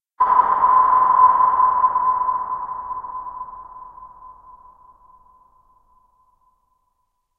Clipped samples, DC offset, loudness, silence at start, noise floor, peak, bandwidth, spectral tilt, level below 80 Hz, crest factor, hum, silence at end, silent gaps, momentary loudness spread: under 0.1%; under 0.1%; -17 LUFS; 0.2 s; -71 dBFS; -2 dBFS; 3.3 kHz; -7 dB/octave; -56 dBFS; 18 dB; none; 3.05 s; none; 21 LU